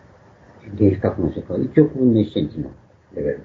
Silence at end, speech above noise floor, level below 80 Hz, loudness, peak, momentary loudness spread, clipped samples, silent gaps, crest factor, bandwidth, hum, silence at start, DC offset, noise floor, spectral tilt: 0 s; 29 dB; -46 dBFS; -19 LUFS; 0 dBFS; 17 LU; under 0.1%; none; 20 dB; 4.7 kHz; none; 0.65 s; under 0.1%; -48 dBFS; -10.5 dB/octave